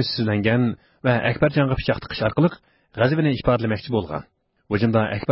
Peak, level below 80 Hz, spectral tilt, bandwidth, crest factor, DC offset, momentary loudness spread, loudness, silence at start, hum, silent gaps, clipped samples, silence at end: -6 dBFS; -44 dBFS; -11 dB/octave; 5.8 kHz; 16 dB; under 0.1%; 6 LU; -22 LUFS; 0 s; none; none; under 0.1%; 0 s